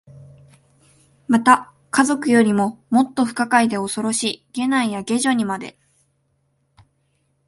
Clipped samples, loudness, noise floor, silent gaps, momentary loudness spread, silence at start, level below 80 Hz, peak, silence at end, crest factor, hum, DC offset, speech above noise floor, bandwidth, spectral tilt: under 0.1%; -19 LUFS; -67 dBFS; none; 9 LU; 0.15 s; -64 dBFS; 0 dBFS; 1.75 s; 20 dB; none; under 0.1%; 48 dB; 11.5 kHz; -4 dB/octave